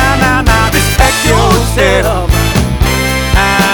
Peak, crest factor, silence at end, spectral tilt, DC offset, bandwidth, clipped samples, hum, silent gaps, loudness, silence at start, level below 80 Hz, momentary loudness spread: 0 dBFS; 10 dB; 0 s; -4 dB/octave; under 0.1%; over 20 kHz; under 0.1%; none; none; -10 LUFS; 0 s; -16 dBFS; 3 LU